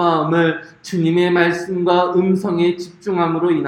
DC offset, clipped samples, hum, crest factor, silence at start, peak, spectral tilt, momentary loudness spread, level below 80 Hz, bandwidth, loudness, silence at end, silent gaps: under 0.1%; under 0.1%; none; 16 dB; 0 s; 0 dBFS; -7 dB/octave; 7 LU; -60 dBFS; 11 kHz; -17 LUFS; 0 s; none